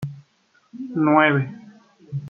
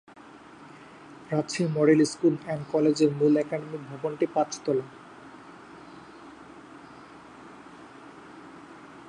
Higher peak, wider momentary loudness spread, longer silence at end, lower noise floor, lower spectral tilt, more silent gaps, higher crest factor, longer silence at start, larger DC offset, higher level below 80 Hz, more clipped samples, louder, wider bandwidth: first, -2 dBFS vs -10 dBFS; second, 19 LU vs 25 LU; about the same, 0 s vs 0 s; first, -62 dBFS vs -49 dBFS; first, -8.5 dB/octave vs -6 dB/octave; neither; about the same, 22 dB vs 20 dB; second, 0 s vs 0.35 s; neither; about the same, -66 dBFS vs -70 dBFS; neither; first, -19 LUFS vs -26 LUFS; second, 4.6 kHz vs 11 kHz